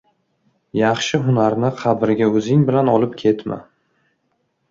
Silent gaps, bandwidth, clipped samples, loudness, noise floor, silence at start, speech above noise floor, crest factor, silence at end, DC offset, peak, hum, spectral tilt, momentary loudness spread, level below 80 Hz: none; 7.8 kHz; under 0.1%; -17 LUFS; -68 dBFS; 0.75 s; 52 dB; 16 dB; 1.1 s; under 0.1%; -2 dBFS; none; -6.5 dB/octave; 8 LU; -58 dBFS